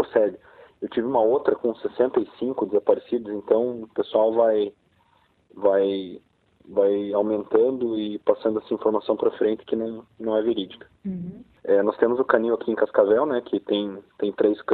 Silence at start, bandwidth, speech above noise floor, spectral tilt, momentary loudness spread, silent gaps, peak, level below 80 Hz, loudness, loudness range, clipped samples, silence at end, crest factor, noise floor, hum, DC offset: 0 s; 4.5 kHz; 40 dB; -9.5 dB/octave; 11 LU; none; -4 dBFS; -64 dBFS; -23 LUFS; 2 LU; under 0.1%; 0 s; 20 dB; -63 dBFS; none; under 0.1%